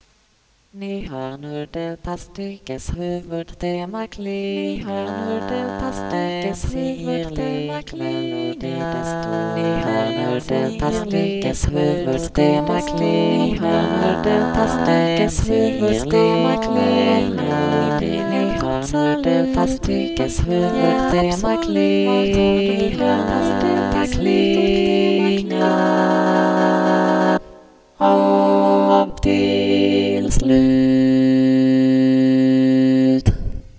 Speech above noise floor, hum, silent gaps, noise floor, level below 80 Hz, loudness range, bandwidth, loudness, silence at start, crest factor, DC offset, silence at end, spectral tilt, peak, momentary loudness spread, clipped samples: 40 dB; none; none; -59 dBFS; -34 dBFS; 10 LU; 8 kHz; -18 LUFS; 0.75 s; 18 dB; under 0.1%; 0.1 s; -6.5 dB/octave; 0 dBFS; 12 LU; under 0.1%